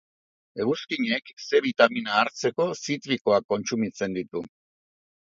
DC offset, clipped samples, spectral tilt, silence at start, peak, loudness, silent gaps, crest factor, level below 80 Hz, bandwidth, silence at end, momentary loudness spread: under 0.1%; under 0.1%; -4 dB/octave; 0.55 s; -2 dBFS; -25 LUFS; 3.21-3.25 s, 3.44-3.49 s; 24 dB; -68 dBFS; 7.8 kHz; 0.9 s; 10 LU